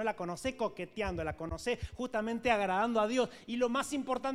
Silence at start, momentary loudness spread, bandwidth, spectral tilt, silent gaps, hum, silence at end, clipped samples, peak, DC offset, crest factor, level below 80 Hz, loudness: 0 s; 7 LU; 15 kHz; -4.5 dB/octave; none; none; 0 s; under 0.1%; -14 dBFS; under 0.1%; 18 dB; -52 dBFS; -34 LUFS